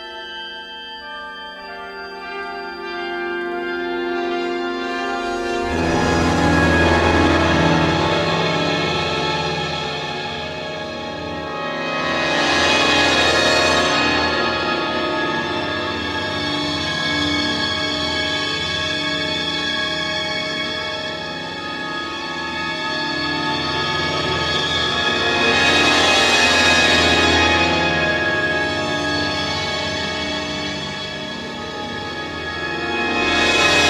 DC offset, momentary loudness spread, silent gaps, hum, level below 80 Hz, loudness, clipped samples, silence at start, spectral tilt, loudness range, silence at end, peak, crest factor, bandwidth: under 0.1%; 13 LU; none; none; -40 dBFS; -18 LUFS; under 0.1%; 0 s; -3.5 dB/octave; 10 LU; 0 s; -2 dBFS; 18 dB; 15 kHz